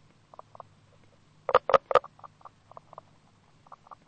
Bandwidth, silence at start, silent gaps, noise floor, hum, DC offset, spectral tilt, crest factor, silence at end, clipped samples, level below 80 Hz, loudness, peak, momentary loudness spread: 8.8 kHz; 1.5 s; none; -61 dBFS; none; under 0.1%; -4.5 dB/octave; 28 dB; 1.8 s; under 0.1%; -66 dBFS; -26 LUFS; -4 dBFS; 27 LU